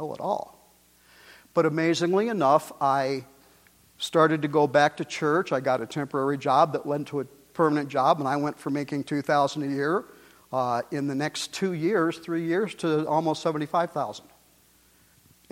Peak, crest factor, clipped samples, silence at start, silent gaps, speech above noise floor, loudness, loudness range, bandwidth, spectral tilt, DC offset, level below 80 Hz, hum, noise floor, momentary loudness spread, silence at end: -6 dBFS; 20 dB; under 0.1%; 0 s; none; 35 dB; -26 LUFS; 4 LU; 16.5 kHz; -5.5 dB/octave; under 0.1%; -70 dBFS; none; -60 dBFS; 8 LU; 1.3 s